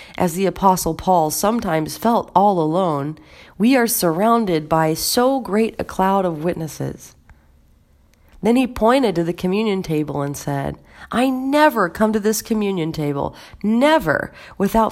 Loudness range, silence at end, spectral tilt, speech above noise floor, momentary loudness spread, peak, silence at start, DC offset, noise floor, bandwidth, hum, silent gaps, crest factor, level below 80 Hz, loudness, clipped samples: 4 LU; 0 s; -5 dB/octave; 35 dB; 10 LU; 0 dBFS; 0 s; under 0.1%; -54 dBFS; 16.5 kHz; none; none; 18 dB; -44 dBFS; -19 LUFS; under 0.1%